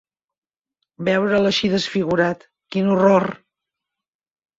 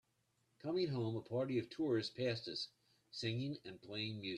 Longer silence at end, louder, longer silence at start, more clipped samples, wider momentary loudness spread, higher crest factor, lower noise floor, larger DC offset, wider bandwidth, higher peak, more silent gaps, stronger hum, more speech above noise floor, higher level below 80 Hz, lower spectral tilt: first, 1.2 s vs 0 s; first, -19 LUFS vs -42 LUFS; first, 1 s vs 0.65 s; neither; about the same, 11 LU vs 10 LU; about the same, 18 dB vs 16 dB; about the same, -84 dBFS vs -81 dBFS; neither; second, 7.8 kHz vs 10.5 kHz; first, -2 dBFS vs -26 dBFS; neither; neither; first, 66 dB vs 40 dB; first, -58 dBFS vs -78 dBFS; about the same, -6 dB/octave vs -6.5 dB/octave